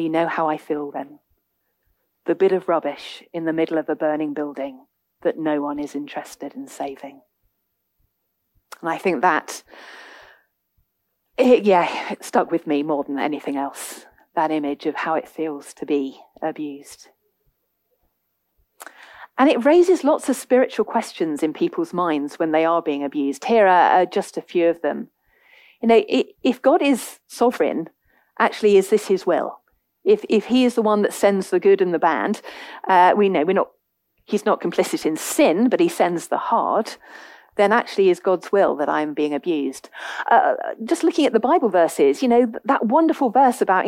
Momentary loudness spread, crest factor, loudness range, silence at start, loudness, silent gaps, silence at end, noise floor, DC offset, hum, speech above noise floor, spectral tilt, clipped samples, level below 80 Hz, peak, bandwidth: 15 LU; 18 dB; 9 LU; 0 s; -20 LUFS; none; 0 s; -74 dBFS; under 0.1%; none; 54 dB; -5 dB/octave; under 0.1%; -70 dBFS; -4 dBFS; 16.5 kHz